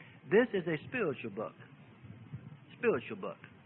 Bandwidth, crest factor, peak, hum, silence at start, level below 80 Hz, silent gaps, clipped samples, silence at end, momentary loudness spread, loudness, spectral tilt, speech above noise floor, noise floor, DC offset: 4.1 kHz; 22 dB; -14 dBFS; none; 0 s; -76 dBFS; none; under 0.1%; 0.15 s; 24 LU; -34 LUFS; -5 dB/octave; 20 dB; -53 dBFS; under 0.1%